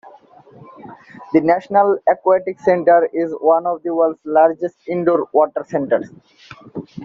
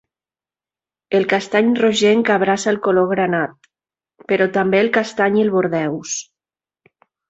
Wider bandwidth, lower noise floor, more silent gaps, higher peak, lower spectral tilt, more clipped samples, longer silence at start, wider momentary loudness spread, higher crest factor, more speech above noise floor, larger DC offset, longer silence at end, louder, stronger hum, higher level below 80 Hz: second, 7 kHz vs 8 kHz; second, -45 dBFS vs under -90 dBFS; neither; about the same, -2 dBFS vs -2 dBFS; first, -6.5 dB/octave vs -4.5 dB/octave; neither; second, 0.05 s vs 1.1 s; about the same, 9 LU vs 7 LU; about the same, 16 dB vs 16 dB; second, 29 dB vs over 74 dB; neither; second, 0 s vs 1.1 s; about the same, -17 LUFS vs -17 LUFS; neither; about the same, -64 dBFS vs -62 dBFS